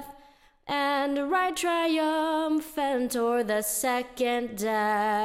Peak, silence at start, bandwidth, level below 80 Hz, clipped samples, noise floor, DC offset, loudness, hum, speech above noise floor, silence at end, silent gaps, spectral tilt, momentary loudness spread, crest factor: -14 dBFS; 0 s; 16.5 kHz; -60 dBFS; under 0.1%; -57 dBFS; under 0.1%; -27 LUFS; none; 30 dB; 0 s; none; -3 dB/octave; 4 LU; 14 dB